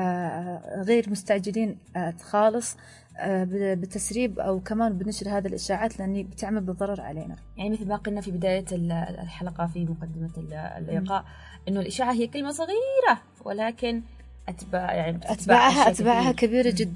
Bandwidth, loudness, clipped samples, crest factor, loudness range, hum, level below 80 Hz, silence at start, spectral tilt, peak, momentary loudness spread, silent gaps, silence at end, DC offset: 11.5 kHz; -26 LUFS; under 0.1%; 22 dB; 7 LU; none; -48 dBFS; 0 s; -5 dB/octave; -4 dBFS; 13 LU; none; 0 s; under 0.1%